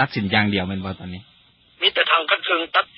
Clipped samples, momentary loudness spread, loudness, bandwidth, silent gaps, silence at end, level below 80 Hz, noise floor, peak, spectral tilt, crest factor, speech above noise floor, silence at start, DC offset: under 0.1%; 16 LU; -19 LUFS; 5.8 kHz; none; 0.15 s; -48 dBFS; -51 dBFS; -2 dBFS; -9 dB/octave; 20 dB; 29 dB; 0 s; under 0.1%